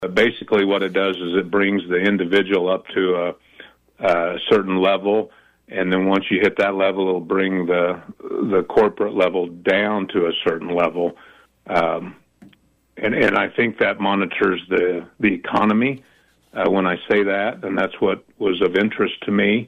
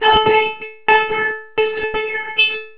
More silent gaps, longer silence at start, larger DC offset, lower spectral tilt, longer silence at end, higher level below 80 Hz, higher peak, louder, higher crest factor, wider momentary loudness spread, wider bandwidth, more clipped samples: neither; about the same, 0 s vs 0 s; second, under 0.1% vs 0.8%; about the same, -7 dB/octave vs -6.5 dB/octave; about the same, 0 s vs 0.1 s; second, -58 dBFS vs -44 dBFS; second, -6 dBFS vs 0 dBFS; second, -19 LUFS vs -16 LUFS; about the same, 14 dB vs 16 dB; about the same, 6 LU vs 8 LU; first, 8.6 kHz vs 4 kHz; neither